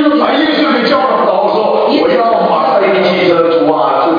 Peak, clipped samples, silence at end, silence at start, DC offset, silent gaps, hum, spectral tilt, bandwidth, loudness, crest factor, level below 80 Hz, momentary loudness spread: 0 dBFS; under 0.1%; 0 s; 0 s; under 0.1%; none; none; -7 dB/octave; 5.2 kHz; -10 LUFS; 10 dB; -56 dBFS; 1 LU